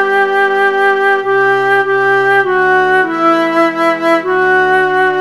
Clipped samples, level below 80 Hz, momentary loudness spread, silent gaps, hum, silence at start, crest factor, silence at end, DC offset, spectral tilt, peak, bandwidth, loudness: under 0.1%; -64 dBFS; 2 LU; none; none; 0 s; 10 dB; 0 s; 0.6%; -5 dB/octave; 0 dBFS; 12.5 kHz; -11 LUFS